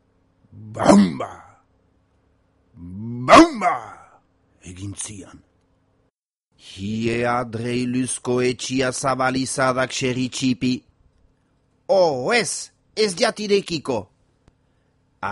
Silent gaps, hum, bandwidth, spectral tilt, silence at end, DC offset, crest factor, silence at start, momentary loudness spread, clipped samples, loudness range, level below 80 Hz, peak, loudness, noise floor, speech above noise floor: none; none; 11.5 kHz; -4.5 dB/octave; 0 s; under 0.1%; 22 dB; 0.55 s; 18 LU; under 0.1%; 8 LU; -52 dBFS; 0 dBFS; -20 LUFS; -71 dBFS; 50 dB